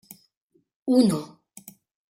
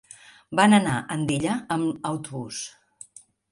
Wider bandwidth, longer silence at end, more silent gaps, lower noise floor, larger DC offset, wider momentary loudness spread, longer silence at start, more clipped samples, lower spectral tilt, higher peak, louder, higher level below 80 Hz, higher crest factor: first, 16.5 kHz vs 11.5 kHz; about the same, 0.85 s vs 0.8 s; neither; first, -69 dBFS vs -49 dBFS; neither; first, 26 LU vs 22 LU; first, 0.85 s vs 0.5 s; neither; first, -6.5 dB/octave vs -5 dB/octave; second, -8 dBFS vs -4 dBFS; about the same, -23 LUFS vs -24 LUFS; second, -70 dBFS vs -58 dBFS; about the same, 18 dB vs 22 dB